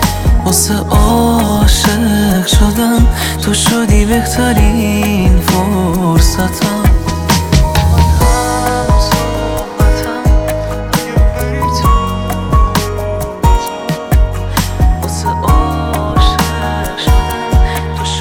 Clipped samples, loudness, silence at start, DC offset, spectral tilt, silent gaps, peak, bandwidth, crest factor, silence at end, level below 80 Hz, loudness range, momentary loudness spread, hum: under 0.1%; -12 LUFS; 0 s; under 0.1%; -5 dB/octave; none; 0 dBFS; 18 kHz; 10 dB; 0 s; -14 dBFS; 3 LU; 6 LU; none